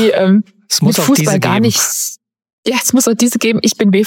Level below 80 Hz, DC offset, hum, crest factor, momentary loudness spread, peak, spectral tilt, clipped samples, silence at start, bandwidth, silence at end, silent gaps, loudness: -58 dBFS; under 0.1%; none; 12 dB; 6 LU; 0 dBFS; -4 dB/octave; under 0.1%; 0 s; 17 kHz; 0 s; 2.53-2.63 s; -12 LUFS